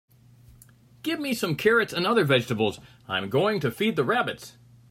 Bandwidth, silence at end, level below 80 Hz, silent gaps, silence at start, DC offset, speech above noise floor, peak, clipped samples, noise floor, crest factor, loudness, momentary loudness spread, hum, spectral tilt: 16 kHz; 0.4 s; -62 dBFS; none; 1.05 s; under 0.1%; 29 dB; -8 dBFS; under 0.1%; -54 dBFS; 18 dB; -25 LUFS; 11 LU; none; -5 dB/octave